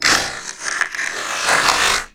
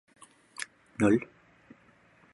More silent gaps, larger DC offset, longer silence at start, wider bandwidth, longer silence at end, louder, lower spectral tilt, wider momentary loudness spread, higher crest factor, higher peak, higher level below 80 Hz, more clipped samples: neither; first, 0.1% vs under 0.1%; second, 0 s vs 0.6 s; first, over 20 kHz vs 11.5 kHz; second, 0.05 s vs 1.1 s; first, -17 LUFS vs -30 LUFS; second, 0 dB/octave vs -6 dB/octave; second, 10 LU vs 21 LU; about the same, 18 dB vs 22 dB; first, 0 dBFS vs -12 dBFS; first, -46 dBFS vs -62 dBFS; neither